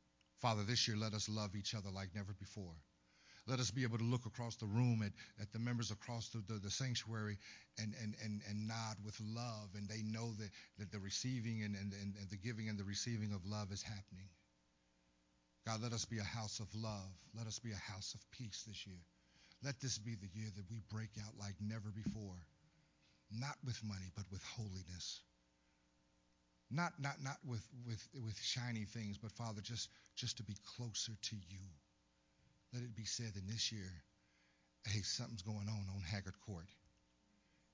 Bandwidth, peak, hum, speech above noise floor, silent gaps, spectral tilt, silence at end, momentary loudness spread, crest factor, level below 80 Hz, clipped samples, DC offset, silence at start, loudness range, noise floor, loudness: 7.6 kHz; -24 dBFS; none; 33 dB; none; -4 dB/octave; 1 s; 12 LU; 24 dB; -66 dBFS; under 0.1%; under 0.1%; 0.4 s; 6 LU; -78 dBFS; -46 LUFS